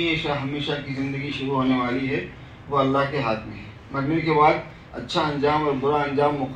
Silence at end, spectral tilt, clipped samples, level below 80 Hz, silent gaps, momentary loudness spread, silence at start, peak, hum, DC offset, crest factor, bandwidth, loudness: 0 s; -7 dB/octave; under 0.1%; -48 dBFS; none; 12 LU; 0 s; -6 dBFS; none; under 0.1%; 18 dB; 9.4 kHz; -23 LUFS